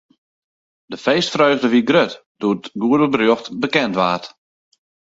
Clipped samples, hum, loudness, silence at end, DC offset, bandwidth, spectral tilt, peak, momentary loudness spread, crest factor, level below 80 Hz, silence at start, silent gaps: under 0.1%; none; -17 LUFS; 0.8 s; under 0.1%; 7.8 kHz; -5 dB/octave; 0 dBFS; 9 LU; 18 dB; -62 dBFS; 0.9 s; 2.26-2.35 s